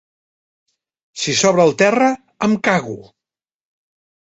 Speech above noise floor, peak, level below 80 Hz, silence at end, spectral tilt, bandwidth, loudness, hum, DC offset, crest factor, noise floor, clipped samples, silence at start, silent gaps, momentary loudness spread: 74 dB; -2 dBFS; -60 dBFS; 1.2 s; -4 dB/octave; 8.2 kHz; -16 LUFS; none; under 0.1%; 18 dB; -89 dBFS; under 0.1%; 1.15 s; none; 17 LU